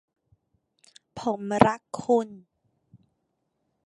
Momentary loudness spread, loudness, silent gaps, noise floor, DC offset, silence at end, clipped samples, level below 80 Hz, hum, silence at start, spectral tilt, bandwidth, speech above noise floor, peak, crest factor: 15 LU; -25 LUFS; none; -77 dBFS; under 0.1%; 1.5 s; under 0.1%; -60 dBFS; none; 1.15 s; -6.5 dB/octave; 11.5 kHz; 52 dB; -2 dBFS; 28 dB